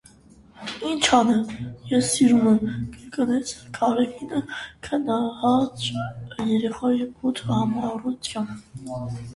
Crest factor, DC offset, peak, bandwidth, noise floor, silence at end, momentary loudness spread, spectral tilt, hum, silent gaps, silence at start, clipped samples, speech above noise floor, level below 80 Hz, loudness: 20 dB; under 0.1%; -4 dBFS; 11.5 kHz; -51 dBFS; 0 s; 15 LU; -4.5 dB/octave; none; none; 0.55 s; under 0.1%; 28 dB; -54 dBFS; -23 LUFS